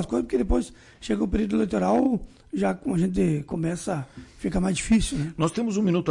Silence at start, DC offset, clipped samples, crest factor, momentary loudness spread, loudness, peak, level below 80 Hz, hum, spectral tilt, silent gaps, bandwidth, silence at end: 0 s; under 0.1%; under 0.1%; 12 dB; 9 LU; -25 LUFS; -12 dBFS; -38 dBFS; none; -6.5 dB/octave; none; 11.5 kHz; 0 s